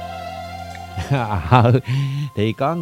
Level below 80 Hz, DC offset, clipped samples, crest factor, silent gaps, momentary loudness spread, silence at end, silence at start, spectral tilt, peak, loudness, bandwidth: -42 dBFS; under 0.1%; under 0.1%; 20 dB; none; 17 LU; 0 s; 0 s; -7.5 dB/octave; 0 dBFS; -19 LUFS; 12.5 kHz